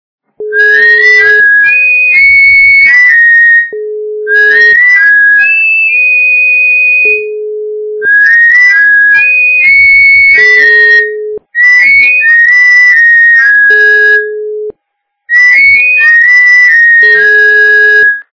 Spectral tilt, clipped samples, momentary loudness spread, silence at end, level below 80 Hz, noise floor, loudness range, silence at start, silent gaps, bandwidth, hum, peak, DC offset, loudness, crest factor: -1 dB/octave; 4%; 12 LU; 0.1 s; -48 dBFS; -67 dBFS; 2 LU; 0.4 s; none; 5.4 kHz; none; 0 dBFS; under 0.1%; -2 LUFS; 4 dB